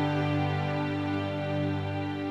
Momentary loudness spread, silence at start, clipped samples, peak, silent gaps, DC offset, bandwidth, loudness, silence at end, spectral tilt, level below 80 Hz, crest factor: 4 LU; 0 s; under 0.1%; -18 dBFS; none; under 0.1%; 7.8 kHz; -30 LUFS; 0 s; -8 dB/octave; -60 dBFS; 12 dB